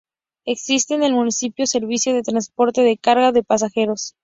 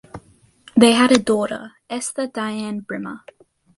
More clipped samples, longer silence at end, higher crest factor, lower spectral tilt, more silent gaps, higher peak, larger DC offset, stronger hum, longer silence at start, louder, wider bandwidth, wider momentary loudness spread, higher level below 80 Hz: neither; second, 0.15 s vs 0.6 s; about the same, 16 dB vs 20 dB; second, -2.5 dB/octave vs -4 dB/octave; neither; about the same, -2 dBFS vs 0 dBFS; neither; neither; first, 0.45 s vs 0.15 s; about the same, -18 LUFS vs -19 LUFS; second, 7.8 kHz vs 11.5 kHz; second, 7 LU vs 18 LU; about the same, -62 dBFS vs -58 dBFS